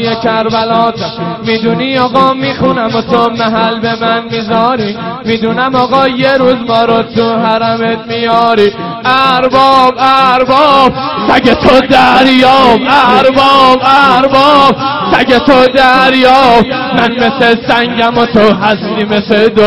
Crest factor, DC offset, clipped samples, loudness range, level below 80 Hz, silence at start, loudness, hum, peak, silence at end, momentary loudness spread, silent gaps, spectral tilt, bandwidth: 8 dB; under 0.1%; 2%; 5 LU; -38 dBFS; 0 s; -8 LUFS; none; 0 dBFS; 0 s; 7 LU; none; -5.5 dB/octave; 13.5 kHz